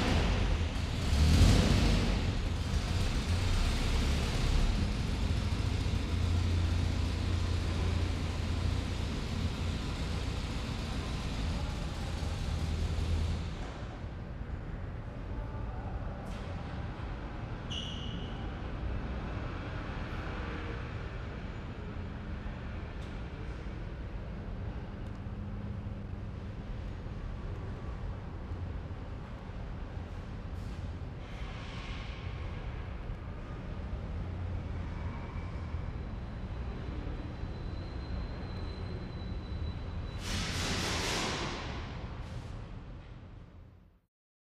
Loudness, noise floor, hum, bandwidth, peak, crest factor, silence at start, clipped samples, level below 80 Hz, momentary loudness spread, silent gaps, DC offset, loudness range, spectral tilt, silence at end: -36 LUFS; -56 dBFS; none; 13.5 kHz; -12 dBFS; 22 dB; 0 s; under 0.1%; -38 dBFS; 11 LU; none; under 0.1%; 9 LU; -5.5 dB/octave; 0.6 s